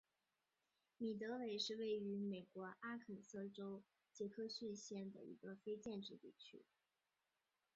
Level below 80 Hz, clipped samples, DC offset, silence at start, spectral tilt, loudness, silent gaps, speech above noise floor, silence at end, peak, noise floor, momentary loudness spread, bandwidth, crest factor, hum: -90 dBFS; under 0.1%; under 0.1%; 1 s; -4 dB/octave; -50 LUFS; none; over 40 dB; 1.15 s; -32 dBFS; under -90 dBFS; 14 LU; 7.6 kHz; 20 dB; none